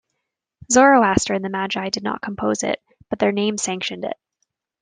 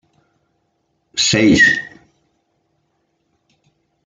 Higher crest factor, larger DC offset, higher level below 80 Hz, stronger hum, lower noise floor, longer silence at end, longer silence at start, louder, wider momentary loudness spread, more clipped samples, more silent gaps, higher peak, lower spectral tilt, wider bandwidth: about the same, 20 dB vs 18 dB; neither; about the same, -52 dBFS vs -52 dBFS; neither; first, -79 dBFS vs -67 dBFS; second, 0.7 s vs 2.15 s; second, 0.7 s vs 1.15 s; second, -20 LUFS vs -13 LUFS; about the same, 16 LU vs 16 LU; neither; neither; about the same, -2 dBFS vs -2 dBFS; about the same, -3.5 dB/octave vs -3 dB/octave; about the same, 10 kHz vs 9.6 kHz